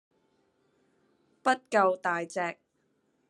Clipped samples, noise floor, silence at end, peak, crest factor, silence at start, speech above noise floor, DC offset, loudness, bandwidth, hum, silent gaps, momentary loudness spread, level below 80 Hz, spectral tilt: under 0.1%; -74 dBFS; 0.75 s; -10 dBFS; 22 dB; 1.45 s; 46 dB; under 0.1%; -29 LUFS; 11.5 kHz; none; none; 9 LU; -90 dBFS; -4 dB/octave